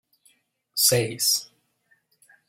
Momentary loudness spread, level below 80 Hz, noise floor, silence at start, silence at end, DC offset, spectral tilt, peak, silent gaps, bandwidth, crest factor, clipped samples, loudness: 7 LU; -64 dBFS; -67 dBFS; 0.75 s; 1.05 s; under 0.1%; -2 dB/octave; -6 dBFS; none; 16.5 kHz; 22 dB; under 0.1%; -21 LUFS